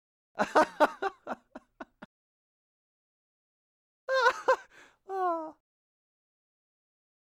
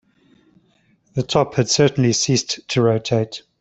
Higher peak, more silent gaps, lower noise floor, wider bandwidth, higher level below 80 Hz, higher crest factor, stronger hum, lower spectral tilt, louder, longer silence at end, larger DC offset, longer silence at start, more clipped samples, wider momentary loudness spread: second, -12 dBFS vs -2 dBFS; first, 2.05-4.08 s vs none; second, -56 dBFS vs -60 dBFS; first, 15 kHz vs 8.4 kHz; second, -74 dBFS vs -54 dBFS; about the same, 22 dB vs 18 dB; neither; about the same, -3.5 dB/octave vs -4.5 dB/octave; second, -29 LUFS vs -19 LUFS; first, 1.75 s vs 0.2 s; neither; second, 0.35 s vs 1.15 s; neither; first, 22 LU vs 9 LU